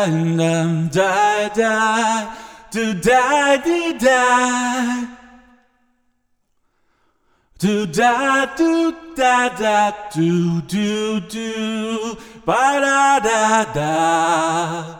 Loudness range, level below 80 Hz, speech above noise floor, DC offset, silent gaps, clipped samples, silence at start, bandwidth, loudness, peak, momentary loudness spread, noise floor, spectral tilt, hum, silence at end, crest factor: 5 LU; -52 dBFS; 48 dB; under 0.1%; none; under 0.1%; 0 s; 18.5 kHz; -17 LUFS; -2 dBFS; 9 LU; -65 dBFS; -4.5 dB/octave; none; 0 s; 16 dB